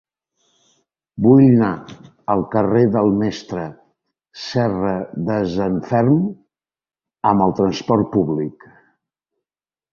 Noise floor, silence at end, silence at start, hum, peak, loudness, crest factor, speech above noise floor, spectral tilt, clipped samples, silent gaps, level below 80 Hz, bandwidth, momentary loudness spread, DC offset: under -90 dBFS; 1.4 s; 1.15 s; none; -2 dBFS; -18 LUFS; 18 dB; over 73 dB; -8 dB/octave; under 0.1%; none; -50 dBFS; 7 kHz; 15 LU; under 0.1%